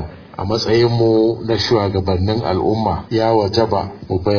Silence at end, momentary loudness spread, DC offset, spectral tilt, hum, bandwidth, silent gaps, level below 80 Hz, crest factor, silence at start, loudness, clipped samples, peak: 0 s; 8 LU; under 0.1%; -7 dB/octave; none; 5.4 kHz; none; -40 dBFS; 16 dB; 0 s; -17 LUFS; under 0.1%; -2 dBFS